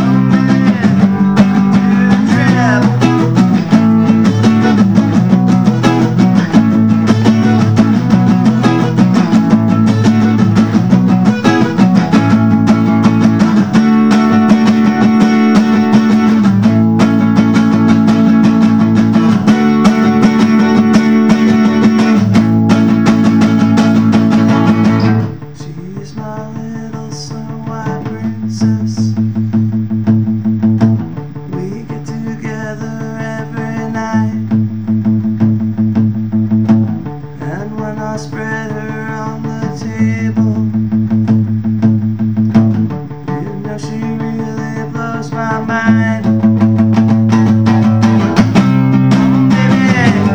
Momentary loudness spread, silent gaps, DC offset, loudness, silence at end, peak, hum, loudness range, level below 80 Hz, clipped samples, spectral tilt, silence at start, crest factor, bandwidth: 12 LU; none; 1%; -11 LUFS; 0 s; 0 dBFS; none; 8 LU; -44 dBFS; under 0.1%; -7.5 dB/octave; 0 s; 10 dB; 8.4 kHz